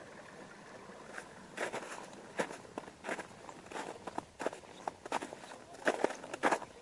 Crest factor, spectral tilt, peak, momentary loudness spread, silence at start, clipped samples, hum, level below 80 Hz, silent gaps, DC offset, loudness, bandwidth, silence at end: 30 dB; -3.5 dB/octave; -12 dBFS; 17 LU; 0 s; under 0.1%; none; -76 dBFS; none; under 0.1%; -41 LUFS; 11.5 kHz; 0 s